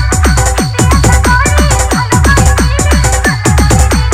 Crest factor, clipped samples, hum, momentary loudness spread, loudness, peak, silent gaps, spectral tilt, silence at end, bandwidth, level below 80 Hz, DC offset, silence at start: 8 dB; 0.3%; none; 3 LU; -9 LUFS; 0 dBFS; none; -4.5 dB/octave; 0 s; 16 kHz; -12 dBFS; under 0.1%; 0 s